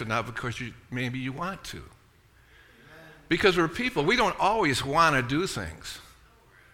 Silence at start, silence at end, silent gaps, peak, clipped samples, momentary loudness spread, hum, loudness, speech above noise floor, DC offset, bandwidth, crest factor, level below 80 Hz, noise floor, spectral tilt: 0 s; 0.65 s; none; -8 dBFS; under 0.1%; 17 LU; none; -26 LUFS; 32 dB; under 0.1%; 17 kHz; 20 dB; -50 dBFS; -59 dBFS; -4.5 dB/octave